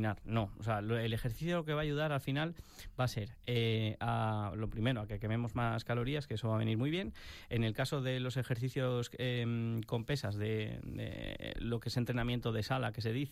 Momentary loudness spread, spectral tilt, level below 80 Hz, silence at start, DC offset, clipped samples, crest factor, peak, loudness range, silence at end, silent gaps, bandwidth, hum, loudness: 6 LU; -6.5 dB/octave; -54 dBFS; 0 s; under 0.1%; under 0.1%; 16 dB; -20 dBFS; 2 LU; 0 s; none; 15 kHz; none; -37 LUFS